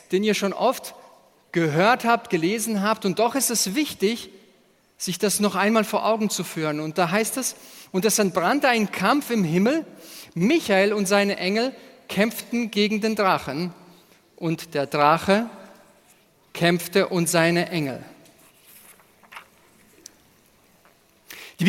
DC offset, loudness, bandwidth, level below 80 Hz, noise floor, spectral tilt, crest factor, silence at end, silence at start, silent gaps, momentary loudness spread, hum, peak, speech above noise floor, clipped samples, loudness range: under 0.1%; -22 LUFS; 17 kHz; -66 dBFS; -59 dBFS; -4 dB/octave; 22 dB; 0 s; 0.1 s; none; 12 LU; none; -2 dBFS; 37 dB; under 0.1%; 3 LU